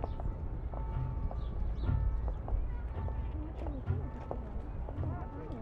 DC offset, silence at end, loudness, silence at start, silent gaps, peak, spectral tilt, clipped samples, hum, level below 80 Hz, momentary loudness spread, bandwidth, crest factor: under 0.1%; 0 s; -39 LUFS; 0 s; none; -20 dBFS; -10 dB/octave; under 0.1%; none; -38 dBFS; 7 LU; 4.3 kHz; 16 dB